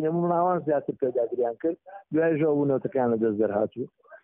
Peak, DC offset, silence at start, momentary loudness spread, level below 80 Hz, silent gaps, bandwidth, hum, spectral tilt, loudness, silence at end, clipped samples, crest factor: -12 dBFS; under 0.1%; 0 s; 8 LU; -70 dBFS; none; 3.5 kHz; none; -5 dB/octave; -26 LUFS; 0.05 s; under 0.1%; 14 dB